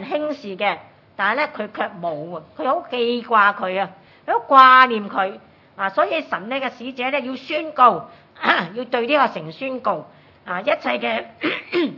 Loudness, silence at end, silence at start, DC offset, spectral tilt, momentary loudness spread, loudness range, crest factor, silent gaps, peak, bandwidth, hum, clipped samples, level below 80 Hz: -19 LUFS; 0 s; 0 s; under 0.1%; -6 dB/octave; 13 LU; 6 LU; 20 dB; none; 0 dBFS; 6 kHz; none; under 0.1%; -72 dBFS